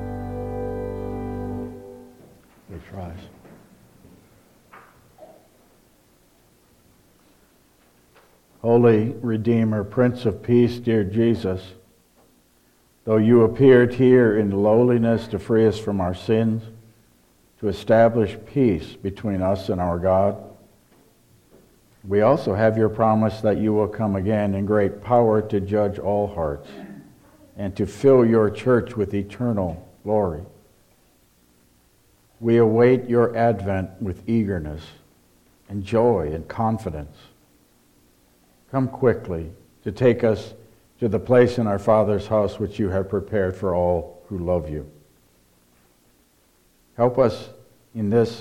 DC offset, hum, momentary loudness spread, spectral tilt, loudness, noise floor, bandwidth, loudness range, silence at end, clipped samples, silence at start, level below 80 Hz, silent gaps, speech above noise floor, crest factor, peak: under 0.1%; none; 17 LU; -8.5 dB/octave; -21 LUFS; -60 dBFS; 13.5 kHz; 9 LU; 0 s; under 0.1%; 0 s; -48 dBFS; none; 40 dB; 18 dB; -4 dBFS